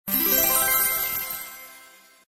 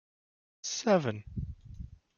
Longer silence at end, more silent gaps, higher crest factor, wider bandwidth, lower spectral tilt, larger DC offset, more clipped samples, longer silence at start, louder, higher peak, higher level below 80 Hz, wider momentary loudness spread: first, 0.45 s vs 0.2 s; neither; about the same, 18 dB vs 22 dB; first, 16.5 kHz vs 7.4 kHz; second, -1 dB/octave vs -4.5 dB/octave; neither; neither; second, 0.05 s vs 0.65 s; first, -20 LUFS vs -32 LUFS; first, -8 dBFS vs -14 dBFS; about the same, -54 dBFS vs -50 dBFS; second, 17 LU vs 20 LU